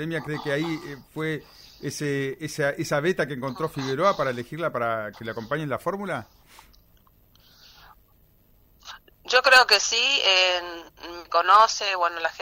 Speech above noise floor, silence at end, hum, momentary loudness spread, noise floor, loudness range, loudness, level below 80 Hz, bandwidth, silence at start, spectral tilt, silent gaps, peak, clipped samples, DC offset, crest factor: 35 dB; 0 s; none; 19 LU; -59 dBFS; 15 LU; -22 LUFS; -60 dBFS; 16 kHz; 0 s; -3 dB/octave; none; -6 dBFS; under 0.1%; under 0.1%; 20 dB